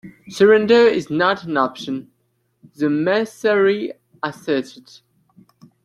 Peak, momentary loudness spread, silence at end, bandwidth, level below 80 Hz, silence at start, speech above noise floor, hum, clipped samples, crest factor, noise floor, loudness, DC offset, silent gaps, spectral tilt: -2 dBFS; 15 LU; 1.15 s; 12.5 kHz; -64 dBFS; 0.05 s; 50 dB; none; under 0.1%; 18 dB; -67 dBFS; -18 LUFS; under 0.1%; none; -5.5 dB/octave